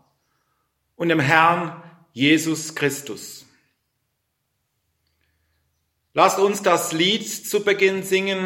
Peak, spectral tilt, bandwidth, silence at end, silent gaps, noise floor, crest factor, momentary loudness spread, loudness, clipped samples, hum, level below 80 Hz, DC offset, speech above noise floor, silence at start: 0 dBFS; -3.5 dB/octave; 16.5 kHz; 0 s; none; -74 dBFS; 22 dB; 15 LU; -20 LUFS; under 0.1%; none; -68 dBFS; under 0.1%; 55 dB; 1 s